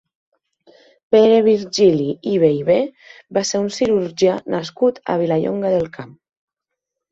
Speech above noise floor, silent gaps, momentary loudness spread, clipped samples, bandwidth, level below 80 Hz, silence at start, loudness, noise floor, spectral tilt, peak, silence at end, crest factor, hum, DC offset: 65 dB; none; 10 LU; under 0.1%; 8 kHz; -58 dBFS; 1.1 s; -17 LUFS; -82 dBFS; -5.5 dB/octave; -2 dBFS; 1.05 s; 16 dB; none; under 0.1%